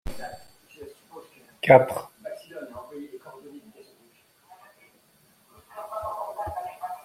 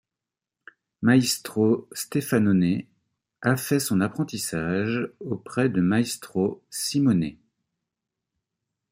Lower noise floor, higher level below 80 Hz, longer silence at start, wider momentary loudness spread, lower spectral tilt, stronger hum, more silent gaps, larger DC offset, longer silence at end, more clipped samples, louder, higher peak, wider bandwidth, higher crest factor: second, -61 dBFS vs -89 dBFS; first, -54 dBFS vs -62 dBFS; second, 0.05 s vs 1 s; first, 30 LU vs 9 LU; about the same, -6 dB/octave vs -5.5 dB/octave; neither; neither; neither; second, 0.05 s vs 1.6 s; neither; about the same, -24 LUFS vs -24 LUFS; first, -2 dBFS vs -6 dBFS; about the same, 16 kHz vs 16 kHz; first, 26 dB vs 20 dB